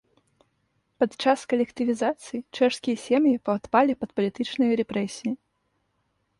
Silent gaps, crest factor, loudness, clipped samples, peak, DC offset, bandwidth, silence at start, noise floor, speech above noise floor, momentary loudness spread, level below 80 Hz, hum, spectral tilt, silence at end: none; 20 dB; -25 LUFS; under 0.1%; -6 dBFS; under 0.1%; 11.5 kHz; 1 s; -73 dBFS; 49 dB; 9 LU; -66 dBFS; none; -5 dB/octave; 1.05 s